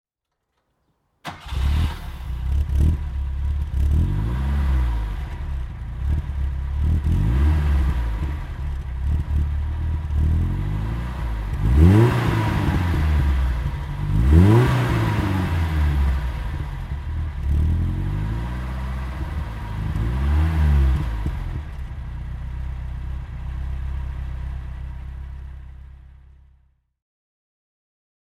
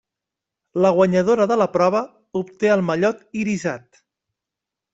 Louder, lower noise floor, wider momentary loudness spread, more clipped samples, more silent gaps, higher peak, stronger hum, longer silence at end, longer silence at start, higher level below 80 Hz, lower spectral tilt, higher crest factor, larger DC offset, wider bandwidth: second, -23 LUFS vs -20 LUFS; second, -79 dBFS vs -85 dBFS; about the same, 14 LU vs 12 LU; neither; neither; about the same, -2 dBFS vs -4 dBFS; neither; first, 2.2 s vs 1.15 s; first, 1.25 s vs 0.75 s; first, -24 dBFS vs -62 dBFS; first, -8 dB/octave vs -6.5 dB/octave; about the same, 20 dB vs 18 dB; neither; first, 12.5 kHz vs 8 kHz